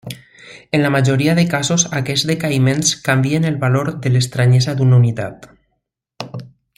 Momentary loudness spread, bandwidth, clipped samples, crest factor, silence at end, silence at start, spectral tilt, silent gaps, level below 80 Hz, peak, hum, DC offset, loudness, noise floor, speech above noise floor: 16 LU; 14 kHz; under 0.1%; 16 dB; 0.3 s; 0.05 s; -5 dB/octave; none; -52 dBFS; 0 dBFS; none; under 0.1%; -15 LUFS; -72 dBFS; 57 dB